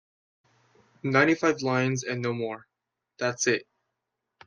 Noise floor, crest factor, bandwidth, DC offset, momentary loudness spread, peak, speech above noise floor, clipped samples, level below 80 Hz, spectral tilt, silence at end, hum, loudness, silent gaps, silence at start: -83 dBFS; 24 dB; 10.5 kHz; under 0.1%; 12 LU; -6 dBFS; 57 dB; under 0.1%; -72 dBFS; -4.5 dB/octave; 0.85 s; none; -26 LUFS; none; 1.05 s